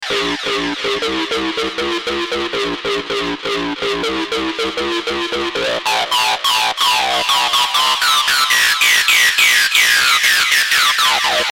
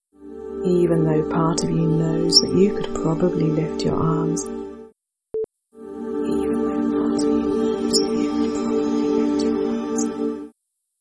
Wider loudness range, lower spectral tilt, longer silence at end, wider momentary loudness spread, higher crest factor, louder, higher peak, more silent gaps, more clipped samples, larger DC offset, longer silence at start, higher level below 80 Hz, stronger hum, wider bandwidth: about the same, 8 LU vs 6 LU; second, -0.5 dB/octave vs -5.5 dB/octave; second, 0 s vs 0.5 s; second, 9 LU vs 14 LU; about the same, 16 dB vs 20 dB; first, -14 LUFS vs -21 LUFS; about the same, 0 dBFS vs -2 dBFS; neither; neither; neither; second, 0 s vs 0.2 s; about the same, -48 dBFS vs -46 dBFS; neither; first, 16.5 kHz vs 11 kHz